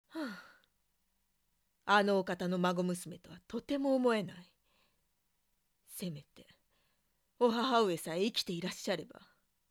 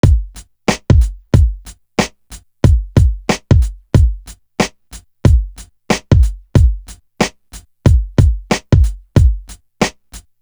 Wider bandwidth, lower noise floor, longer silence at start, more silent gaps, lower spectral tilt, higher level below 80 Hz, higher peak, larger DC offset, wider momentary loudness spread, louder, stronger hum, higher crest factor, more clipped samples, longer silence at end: second, 18 kHz vs over 20 kHz; first, -80 dBFS vs -39 dBFS; about the same, 0.15 s vs 0.05 s; neither; second, -5 dB/octave vs -6.5 dB/octave; second, -76 dBFS vs -16 dBFS; second, -14 dBFS vs 0 dBFS; neither; first, 17 LU vs 8 LU; second, -34 LUFS vs -15 LUFS; neither; first, 22 dB vs 14 dB; neither; first, 0.65 s vs 0.2 s